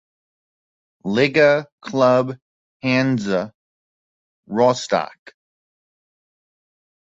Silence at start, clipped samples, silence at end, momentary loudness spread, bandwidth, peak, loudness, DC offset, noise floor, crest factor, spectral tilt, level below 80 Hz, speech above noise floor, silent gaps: 1.05 s; under 0.1%; 1.95 s; 15 LU; 8 kHz; -2 dBFS; -19 LUFS; under 0.1%; under -90 dBFS; 20 dB; -5.5 dB/octave; -62 dBFS; over 72 dB; 1.72-1.78 s, 2.42-2.80 s, 3.55-4.43 s